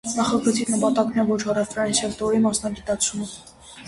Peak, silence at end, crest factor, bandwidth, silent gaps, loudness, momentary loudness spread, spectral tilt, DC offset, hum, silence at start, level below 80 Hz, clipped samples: -6 dBFS; 0 s; 16 dB; 11.5 kHz; none; -22 LUFS; 6 LU; -4 dB/octave; under 0.1%; none; 0.05 s; -52 dBFS; under 0.1%